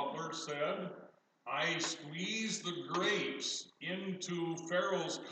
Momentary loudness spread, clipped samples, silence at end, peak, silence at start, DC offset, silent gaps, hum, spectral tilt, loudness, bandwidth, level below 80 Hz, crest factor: 7 LU; under 0.1%; 0 s; -22 dBFS; 0 s; under 0.1%; none; none; -3 dB/octave; -37 LUFS; 9.4 kHz; under -90 dBFS; 16 dB